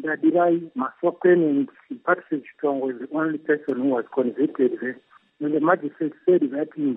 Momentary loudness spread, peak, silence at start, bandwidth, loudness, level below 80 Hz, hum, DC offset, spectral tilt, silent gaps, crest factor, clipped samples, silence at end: 11 LU; -6 dBFS; 0 s; 3.8 kHz; -23 LUFS; -80 dBFS; none; under 0.1%; -10.5 dB/octave; none; 18 dB; under 0.1%; 0 s